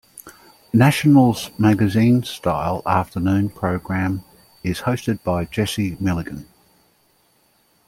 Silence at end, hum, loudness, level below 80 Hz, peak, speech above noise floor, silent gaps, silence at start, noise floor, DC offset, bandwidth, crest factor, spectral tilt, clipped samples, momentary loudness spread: 1.45 s; none; -19 LUFS; -48 dBFS; -2 dBFS; 42 dB; none; 0.25 s; -60 dBFS; under 0.1%; 16.5 kHz; 18 dB; -6.5 dB/octave; under 0.1%; 11 LU